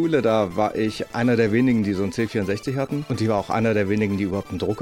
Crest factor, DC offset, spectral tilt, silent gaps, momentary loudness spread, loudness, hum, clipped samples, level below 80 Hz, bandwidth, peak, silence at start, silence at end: 16 dB; under 0.1%; -7 dB/octave; none; 7 LU; -22 LUFS; none; under 0.1%; -52 dBFS; 16 kHz; -6 dBFS; 0 s; 0 s